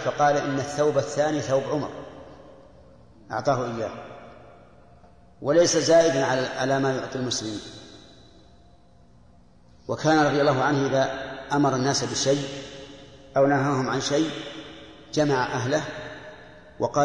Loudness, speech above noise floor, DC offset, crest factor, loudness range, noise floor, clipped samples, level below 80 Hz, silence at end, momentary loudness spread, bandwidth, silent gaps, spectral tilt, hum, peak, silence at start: -24 LUFS; 32 dB; 0.1%; 16 dB; 8 LU; -55 dBFS; under 0.1%; -58 dBFS; 0 s; 21 LU; 10.5 kHz; none; -4.5 dB/octave; 60 Hz at -60 dBFS; -8 dBFS; 0 s